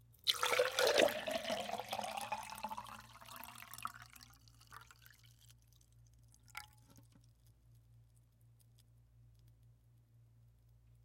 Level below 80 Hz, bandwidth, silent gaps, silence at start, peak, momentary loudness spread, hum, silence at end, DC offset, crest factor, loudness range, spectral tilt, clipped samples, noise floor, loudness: -72 dBFS; 16.5 kHz; none; 0.25 s; -16 dBFS; 26 LU; none; 3.55 s; under 0.1%; 28 dB; 23 LU; -1.5 dB/octave; under 0.1%; -67 dBFS; -38 LUFS